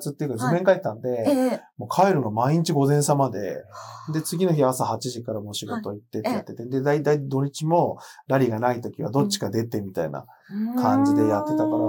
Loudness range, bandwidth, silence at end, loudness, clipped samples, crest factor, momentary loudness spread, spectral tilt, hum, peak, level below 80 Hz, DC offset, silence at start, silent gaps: 4 LU; 18 kHz; 0 s; -24 LUFS; under 0.1%; 18 dB; 11 LU; -6 dB/octave; none; -6 dBFS; -72 dBFS; under 0.1%; 0 s; none